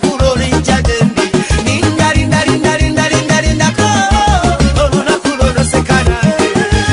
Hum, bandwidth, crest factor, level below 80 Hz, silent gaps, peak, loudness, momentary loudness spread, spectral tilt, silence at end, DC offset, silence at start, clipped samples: none; 11 kHz; 10 dB; -18 dBFS; none; 0 dBFS; -11 LUFS; 2 LU; -5 dB/octave; 0 s; under 0.1%; 0 s; under 0.1%